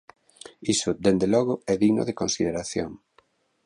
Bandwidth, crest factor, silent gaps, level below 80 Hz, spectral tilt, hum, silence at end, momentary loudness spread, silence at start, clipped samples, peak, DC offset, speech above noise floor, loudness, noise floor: 11.5 kHz; 18 dB; none; -54 dBFS; -4.5 dB/octave; none; 0.7 s; 9 LU; 0.6 s; under 0.1%; -6 dBFS; under 0.1%; 40 dB; -24 LUFS; -64 dBFS